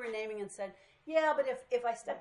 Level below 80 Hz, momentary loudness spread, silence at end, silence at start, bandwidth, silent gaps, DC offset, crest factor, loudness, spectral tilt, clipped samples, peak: -78 dBFS; 14 LU; 0 s; 0 s; 11.5 kHz; none; under 0.1%; 18 dB; -35 LUFS; -3.5 dB/octave; under 0.1%; -18 dBFS